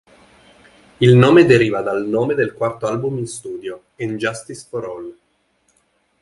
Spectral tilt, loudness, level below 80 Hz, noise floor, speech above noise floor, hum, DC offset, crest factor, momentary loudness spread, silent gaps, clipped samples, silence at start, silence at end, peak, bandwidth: -6.5 dB/octave; -16 LUFS; -52 dBFS; -63 dBFS; 47 dB; none; under 0.1%; 18 dB; 20 LU; none; under 0.1%; 1 s; 1.1 s; 0 dBFS; 11.5 kHz